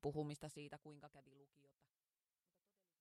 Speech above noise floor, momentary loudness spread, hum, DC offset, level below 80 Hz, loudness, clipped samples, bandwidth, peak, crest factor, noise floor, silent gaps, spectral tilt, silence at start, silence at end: over 39 dB; 17 LU; none; under 0.1%; -76 dBFS; -52 LUFS; under 0.1%; 13.5 kHz; -32 dBFS; 22 dB; under -90 dBFS; none; -6.5 dB/octave; 0.05 s; 1.55 s